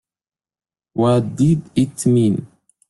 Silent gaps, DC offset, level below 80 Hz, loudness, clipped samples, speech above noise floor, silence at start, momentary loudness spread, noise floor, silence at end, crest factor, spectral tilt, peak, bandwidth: none; under 0.1%; -54 dBFS; -18 LUFS; under 0.1%; over 74 dB; 0.95 s; 6 LU; under -90 dBFS; 0.45 s; 16 dB; -7.5 dB/octave; -4 dBFS; 12 kHz